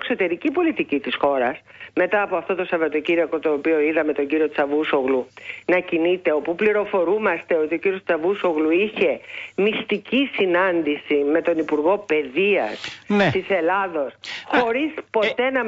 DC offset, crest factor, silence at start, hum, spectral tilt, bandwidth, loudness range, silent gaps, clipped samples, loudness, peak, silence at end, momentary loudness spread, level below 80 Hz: under 0.1%; 14 dB; 0 s; none; -6.5 dB/octave; 7.8 kHz; 1 LU; none; under 0.1%; -21 LUFS; -6 dBFS; 0 s; 5 LU; -62 dBFS